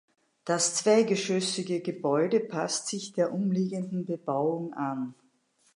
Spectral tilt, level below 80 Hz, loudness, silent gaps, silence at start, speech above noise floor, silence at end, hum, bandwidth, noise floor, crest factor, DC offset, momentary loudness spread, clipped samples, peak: -4.5 dB/octave; -82 dBFS; -28 LUFS; none; 0.45 s; 40 dB; 0.6 s; none; 11.5 kHz; -68 dBFS; 18 dB; under 0.1%; 9 LU; under 0.1%; -12 dBFS